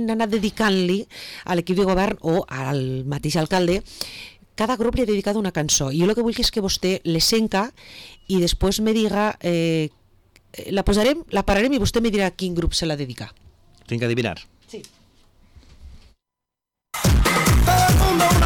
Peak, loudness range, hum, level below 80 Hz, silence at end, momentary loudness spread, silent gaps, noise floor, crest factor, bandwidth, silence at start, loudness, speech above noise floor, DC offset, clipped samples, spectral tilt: -10 dBFS; 7 LU; none; -30 dBFS; 0 s; 16 LU; none; -85 dBFS; 12 dB; 19 kHz; 0 s; -21 LUFS; 63 dB; under 0.1%; under 0.1%; -4.5 dB/octave